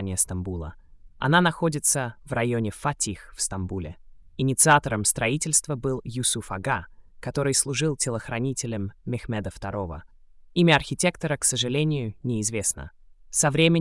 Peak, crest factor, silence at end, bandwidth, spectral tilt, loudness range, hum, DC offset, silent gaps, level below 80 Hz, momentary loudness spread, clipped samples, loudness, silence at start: -6 dBFS; 20 dB; 0 s; 12 kHz; -3.5 dB/octave; 4 LU; none; under 0.1%; none; -48 dBFS; 13 LU; under 0.1%; -24 LUFS; 0 s